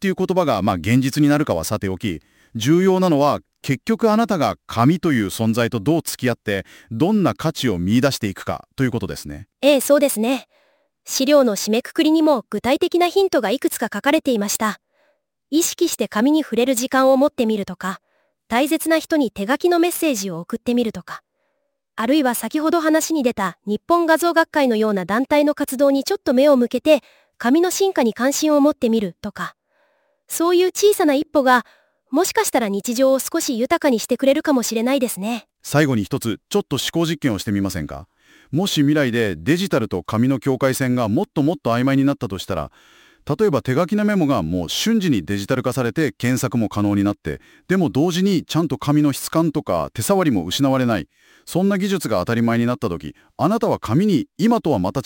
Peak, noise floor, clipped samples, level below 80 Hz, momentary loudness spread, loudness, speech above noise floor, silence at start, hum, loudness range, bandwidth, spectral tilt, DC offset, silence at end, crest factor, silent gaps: 0 dBFS; -73 dBFS; under 0.1%; -52 dBFS; 10 LU; -19 LUFS; 54 dB; 0 s; none; 3 LU; 17 kHz; -5 dB/octave; under 0.1%; 0.05 s; 18 dB; none